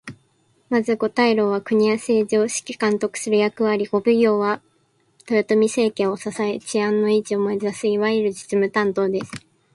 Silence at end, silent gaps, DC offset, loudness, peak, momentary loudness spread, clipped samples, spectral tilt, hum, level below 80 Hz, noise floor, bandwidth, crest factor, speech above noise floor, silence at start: 0.35 s; none; under 0.1%; -20 LUFS; -4 dBFS; 6 LU; under 0.1%; -5 dB/octave; none; -66 dBFS; -63 dBFS; 11.5 kHz; 16 dB; 43 dB; 0.05 s